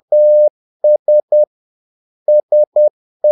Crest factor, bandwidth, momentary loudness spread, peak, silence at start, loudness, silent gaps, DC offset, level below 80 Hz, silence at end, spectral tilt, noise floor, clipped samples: 8 dB; 0.9 kHz; 7 LU; -4 dBFS; 0.1 s; -13 LUFS; 0.50-0.80 s, 0.99-1.06 s, 1.23-1.28 s, 1.47-2.26 s, 2.43-2.49 s, 2.67-2.72 s, 2.90-3.20 s; under 0.1%; -86 dBFS; 0 s; -10.5 dB/octave; under -90 dBFS; under 0.1%